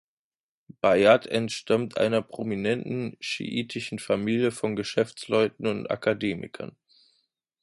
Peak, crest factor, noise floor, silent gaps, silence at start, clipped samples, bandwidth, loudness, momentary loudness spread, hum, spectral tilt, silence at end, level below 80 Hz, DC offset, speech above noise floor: -4 dBFS; 22 dB; under -90 dBFS; none; 0.85 s; under 0.1%; 11.5 kHz; -26 LUFS; 12 LU; none; -5.5 dB/octave; 0.9 s; -64 dBFS; under 0.1%; over 64 dB